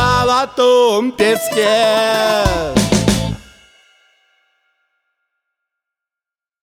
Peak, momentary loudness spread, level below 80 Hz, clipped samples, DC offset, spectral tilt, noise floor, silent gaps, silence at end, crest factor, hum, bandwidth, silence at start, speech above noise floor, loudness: -2 dBFS; 5 LU; -34 dBFS; under 0.1%; under 0.1%; -4.5 dB/octave; -88 dBFS; none; 3.2 s; 14 dB; none; over 20 kHz; 0 s; 75 dB; -14 LUFS